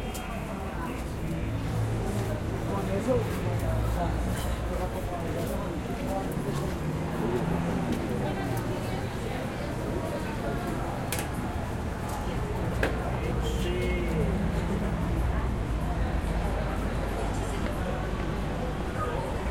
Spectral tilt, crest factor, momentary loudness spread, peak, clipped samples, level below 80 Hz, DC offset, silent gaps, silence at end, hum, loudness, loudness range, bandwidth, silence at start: -6.5 dB/octave; 20 dB; 4 LU; -10 dBFS; under 0.1%; -36 dBFS; under 0.1%; none; 0 s; none; -31 LUFS; 2 LU; 16.5 kHz; 0 s